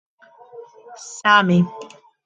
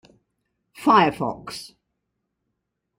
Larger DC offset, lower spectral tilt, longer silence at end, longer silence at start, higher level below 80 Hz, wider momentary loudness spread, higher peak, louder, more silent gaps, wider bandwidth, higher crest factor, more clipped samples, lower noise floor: neither; about the same, -5 dB/octave vs -5.5 dB/octave; second, 0.4 s vs 1.35 s; second, 0.55 s vs 0.8 s; about the same, -64 dBFS vs -60 dBFS; first, 24 LU vs 19 LU; first, 0 dBFS vs -4 dBFS; first, -17 LUFS vs -20 LUFS; neither; second, 8.8 kHz vs 16 kHz; about the same, 22 dB vs 22 dB; neither; second, -43 dBFS vs -79 dBFS